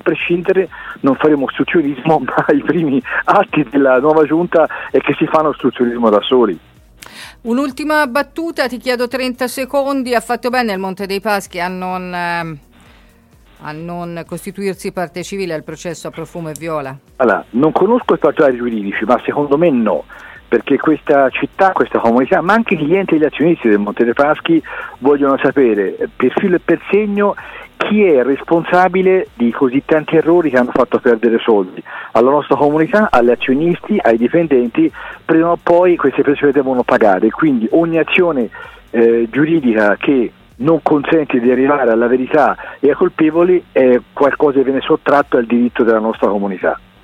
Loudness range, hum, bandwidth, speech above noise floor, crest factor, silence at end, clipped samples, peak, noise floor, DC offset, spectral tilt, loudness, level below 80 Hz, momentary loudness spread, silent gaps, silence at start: 7 LU; none; 14.5 kHz; 33 dB; 14 dB; 0.25 s; under 0.1%; 0 dBFS; -46 dBFS; under 0.1%; -6.5 dB/octave; -14 LUFS; -48 dBFS; 10 LU; none; 0.05 s